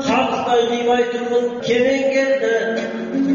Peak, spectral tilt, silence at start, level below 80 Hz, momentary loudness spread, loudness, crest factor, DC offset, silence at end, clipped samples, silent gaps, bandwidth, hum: -6 dBFS; -2.5 dB/octave; 0 s; -56 dBFS; 5 LU; -18 LUFS; 12 dB; under 0.1%; 0 s; under 0.1%; none; 7.4 kHz; none